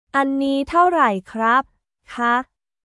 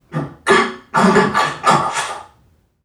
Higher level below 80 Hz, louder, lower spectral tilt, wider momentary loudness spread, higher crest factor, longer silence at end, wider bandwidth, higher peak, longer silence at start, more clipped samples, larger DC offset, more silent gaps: about the same, -54 dBFS vs -52 dBFS; second, -19 LUFS vs -15 LUFS; about the same, -5.5 dB/octave vs -4.5 dB/octave; first, 16 LU vs 13 LU; about the same, 16 dB vs 16 dB; second, 0.4 s vs 0.6 s; second, 11.5 kHz vs 15 kHz; second, -4 dBFS vs 0 dBFS; about the same, 0.15 s vs 0.1 s; neither; neither; neither